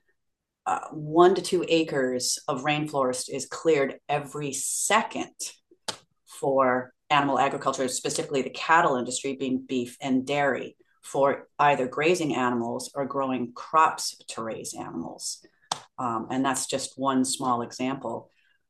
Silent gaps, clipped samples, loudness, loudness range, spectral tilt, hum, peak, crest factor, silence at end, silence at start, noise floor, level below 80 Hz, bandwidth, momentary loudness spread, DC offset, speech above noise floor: none; under 0.1%; -26 LUFS; 4 LU; -3.5 dB/octave; none; -6 dBFS; 20 dB; 0.45 s; 0.65 s; -80 dBFS; -72 dBFS; 12.5 kHz; 13 LU; under 0.1%; 54 dB